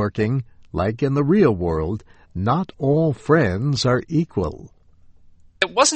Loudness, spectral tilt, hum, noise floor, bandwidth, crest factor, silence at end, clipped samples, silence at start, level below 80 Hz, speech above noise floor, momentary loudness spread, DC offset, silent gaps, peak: -21 LUFS; -5.5 dB/octave; none; -49 dBFS; 8.4 kHz; 18 dB; 0 s; under 0.1%; 0 s; -42 dBFS; 29 dB; 11 LU; under 0.1%; none; -2 dBFS